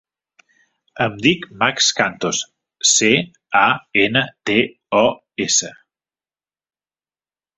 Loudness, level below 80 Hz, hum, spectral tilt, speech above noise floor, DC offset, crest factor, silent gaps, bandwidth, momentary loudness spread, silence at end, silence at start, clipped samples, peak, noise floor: -17 LUFS; -58 dBFS; none; -2 dB/octave; over 72 dB; under 0.1%; 20 dB; none; 8.4 kHz; 9 LU; 1.85 s; 0.95 s; under 0.1%; 0 dBFS; under -90 dBFS